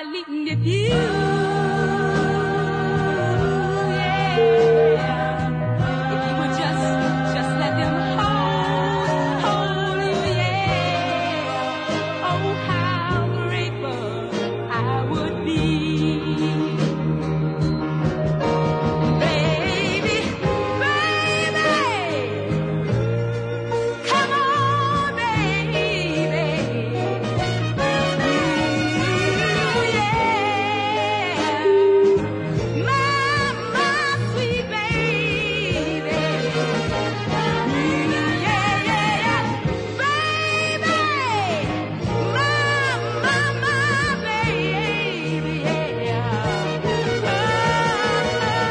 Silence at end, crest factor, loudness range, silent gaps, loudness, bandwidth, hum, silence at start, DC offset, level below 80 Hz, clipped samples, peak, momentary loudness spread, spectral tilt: 0 s; 14 dB; 3 LU; none; -21 LUFS; 10.5 kHz; none; 0 s; under 0.1%; -44 dBFS; under 0.1%; -6 dBFS; 5 LU; -5.5 dB/octave